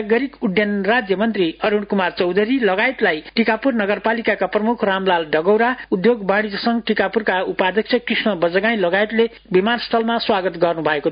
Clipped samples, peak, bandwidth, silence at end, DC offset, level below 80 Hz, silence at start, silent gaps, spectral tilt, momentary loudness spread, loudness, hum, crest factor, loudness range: under 0.1%; -2 dBFS; 5.2 kHz; 0 s; under 0.1%; -54 dBFS; 0 s; none; -10.5 dB/octave; 3 LU; -18 LUFS; none; 16 dB; 0 LU